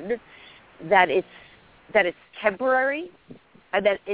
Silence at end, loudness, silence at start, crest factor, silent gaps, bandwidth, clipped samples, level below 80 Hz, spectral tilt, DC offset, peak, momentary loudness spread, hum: 0 s; -23 LUFS; 0 s; 20 dB; none; 4 kHz; under 0.1%; -64 dBFS; -7.5 dB/octave; under 0.1%; -4 dBFS; 15 LU; none